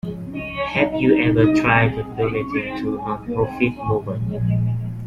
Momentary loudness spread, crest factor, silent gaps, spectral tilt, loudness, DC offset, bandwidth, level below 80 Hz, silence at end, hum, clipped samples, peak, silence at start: 10 LU; 18 dB; none; -8 dB/octave; -20 LUFS; under 0.1%; 7.6 kHz; -42 dBFS; 0 s; none; under 0.1%; -2 dBFS; 0.05 s